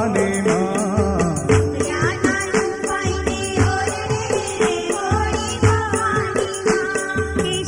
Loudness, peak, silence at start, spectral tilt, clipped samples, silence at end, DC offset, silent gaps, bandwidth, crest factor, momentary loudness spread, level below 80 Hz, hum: -20 LUFS; -2 dBFS; 0 s; -5 dB/octave; under 0.1%; 0 s; under 0.1%; none; 16 kHz; 18 dB; 4 LU; -36 dBFS; none